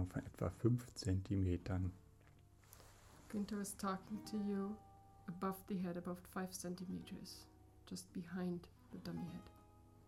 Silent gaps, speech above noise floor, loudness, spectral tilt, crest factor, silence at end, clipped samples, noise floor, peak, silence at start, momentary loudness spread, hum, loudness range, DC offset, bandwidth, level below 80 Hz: none; 22 dB; -45 LUFS; -6.5 dB/octave; 22 dB; 0 s; under 0.1%; -66 dBFS; -22 dBFS; 0 s; 22 LU; none; 5 LU; under 0.1%; 16 kHz; -64 dBFS